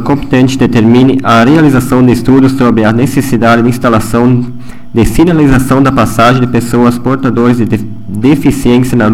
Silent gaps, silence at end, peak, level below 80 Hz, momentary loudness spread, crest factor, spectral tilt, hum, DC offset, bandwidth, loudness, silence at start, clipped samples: none; 0 s; 0 dBFS; -26 dBFS; 5 LU; 8 dB; -7 dB/octave; none; 6%; 16 kHz; -8 LUFS; 0 s; 0.6%